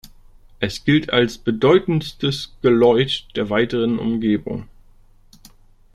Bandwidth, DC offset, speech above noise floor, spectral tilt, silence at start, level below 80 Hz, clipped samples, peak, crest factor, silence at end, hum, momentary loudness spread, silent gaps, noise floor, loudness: 13.5 kHz; under 0.1%; 31 dB; -6.5 dB/octave; 0.6 s; -46 dBFS; under 0.1%; -2 dBFS; 18 dB; 1.3 s; none; 8 LU; none; -49 dBFS; -19 LUFS